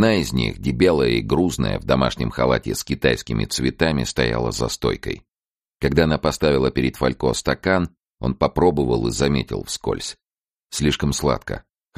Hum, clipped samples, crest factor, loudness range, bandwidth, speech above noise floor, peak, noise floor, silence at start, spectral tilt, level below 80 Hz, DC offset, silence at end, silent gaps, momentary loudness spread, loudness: none; under 0.1%; 18 dB; 2 LU; 15 kHz; over 70 dB; -2 dBFS; under -90 dBFS; 0 s; -5 dB/octave; -36 dBFS; under 0.1%; 0.4 s; 5.46-5.50 s, 10.43-10.47 s, 10.65-10.69 s; 9 LU; -21 LUFS